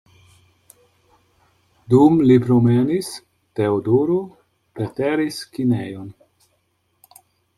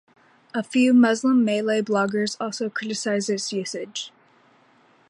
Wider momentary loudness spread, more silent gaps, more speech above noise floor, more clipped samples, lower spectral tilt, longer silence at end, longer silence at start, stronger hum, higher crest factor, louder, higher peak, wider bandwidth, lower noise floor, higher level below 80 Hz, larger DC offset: first, 19 LU vs 14 LU; neither; first, 50 dB vs 36 dB; neither; first, -7.5 dB/octave vs -4 dB/octave; first, 1.45 s vs 1 s; first, 1.9 s vs 0.55 s; neither; about the same, 18 dB vs 16 dB; first, -18 LUFS vs -23 LUFS; first, -2 dBFS vs -8 dBFS; first, 14 kHz vs 11 kHz; first, -67 dBFS vs -58 dBFS; first, -58 dBFS vs -76 dBFS; neither